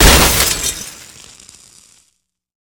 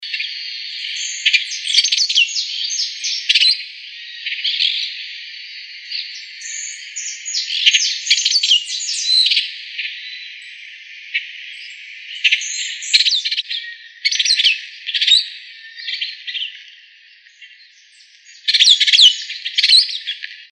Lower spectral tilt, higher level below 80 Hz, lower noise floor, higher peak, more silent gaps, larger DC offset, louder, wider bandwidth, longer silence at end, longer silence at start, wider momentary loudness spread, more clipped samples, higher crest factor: first, -2.5 dB/octave vs 12 dB/octave; first, -22 dBFS vs under -90 dBFS; first, -65 dBFS vs -48 dBFS; about the same, 0 dBFS vs 0 dBFS; neither; neither; first, -11 LUFS vs -15 LUFS; first, over 20 kHz vs 11.5 kHz; first, 1.85 s vs 0.05 s; about the same, 0 s vs 0 s; first, 26 LU vs 20 LU; first, 0.2% vs under 0.1%; about the same, 16 dB vs 20 dB